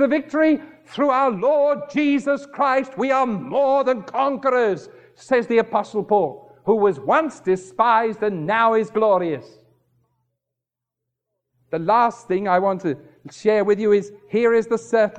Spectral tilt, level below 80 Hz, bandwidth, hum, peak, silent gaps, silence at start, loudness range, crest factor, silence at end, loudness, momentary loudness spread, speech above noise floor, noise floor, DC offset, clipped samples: -6.5 dB/octave; -66 dBFS; 9.2 kHz; none; -4 dBFS; none; 0 s; 4 LU; 16 dB; 0 s; -20 LUFS; 7 LU; 65 dB; -85 dBFS; under 0.1%; under 0.1%